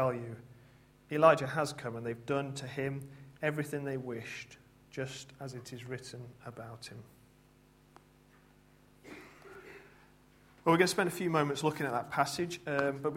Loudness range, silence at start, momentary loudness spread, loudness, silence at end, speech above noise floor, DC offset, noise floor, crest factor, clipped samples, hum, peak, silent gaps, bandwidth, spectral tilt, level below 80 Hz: 20 LU; 0 s; 24 LU; -33 LUFS; 0 s; 30 dB; under 0.1%; -63 dBFS; 26 dB; under 0.1%; none; -10 dBFS; none; 16 kHz; -5 dB/octave; -70 dBFS